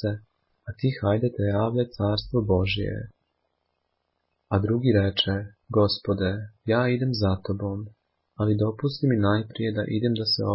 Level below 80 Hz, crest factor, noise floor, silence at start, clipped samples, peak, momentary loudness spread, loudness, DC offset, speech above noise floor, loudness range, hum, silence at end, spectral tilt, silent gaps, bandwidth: -44 dBFS; 18 dB; -76 dBFS; 0 s; under 0.1%; -8 dBFS; 10 LU; -25 LUFS; under 0.1%; 52 dB; 3 LU; none; 0 s; -10 dB/octave; none; 5.8 kHz